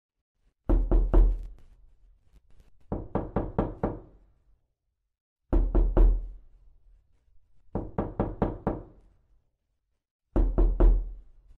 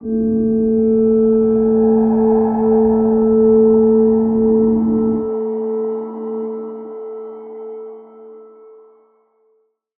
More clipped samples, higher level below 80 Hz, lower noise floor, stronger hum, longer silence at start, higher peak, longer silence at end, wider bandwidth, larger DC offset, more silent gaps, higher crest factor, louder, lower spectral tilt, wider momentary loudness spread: neither; first, -28 dBFS vs -44 dBFS; first, -79 dBFS vs -62 dBFS; neither; first, 0.7 s vs 0 s; second, -10 dBFS vs -4 dBFS; second, 0.4 s vs 1.55 s; about the same, 2.3 kHz vs 2.1 kHz; neither; first, 5.21-5.36 s, 10.11-10.19 s vs none; first, 18 dB vs 12 dB; second, -30 LUFS vs -15 LUFS; second, -11 dB/octave vs -14.5 dB/octave; second, 14 LU vs 18 LU